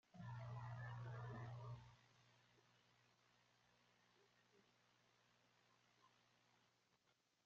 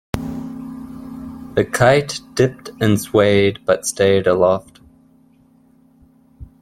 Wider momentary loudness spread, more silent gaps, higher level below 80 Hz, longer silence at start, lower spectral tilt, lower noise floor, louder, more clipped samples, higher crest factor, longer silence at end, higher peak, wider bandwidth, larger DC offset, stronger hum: second, 5 LU vs 18 LU; neither; second, -80 dBFS vs -46 dBFS; about the same, 0.15 s vs 0.15 s; about the same, -6 dB/octave vs -5 dB/octave; first, -84 dBFS vs -52 dBFS; second, -55 LUFS vs -17 LUFS; neither; about the same, 18 dB vs 18 dB; first, 1.4 s vs 0.15 s; second, -42 dBFS vs -2 dBFS; second, 7.2 kHz vs 16.5 kHz; neither; first, 60 Hz at -75 dBFS vs none